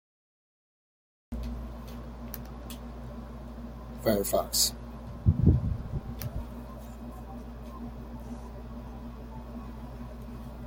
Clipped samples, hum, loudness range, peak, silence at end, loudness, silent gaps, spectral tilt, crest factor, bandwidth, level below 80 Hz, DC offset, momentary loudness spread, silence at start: under 0.1%; 60 Hz at -50 dBFS; 14 LU; -10 dBFS; 0 s; -34 LUFS; none; -5 dB/octave; 24 dB; 17 kHz; -40 dBFS; under 0.1%; 18 LU; 1.3 s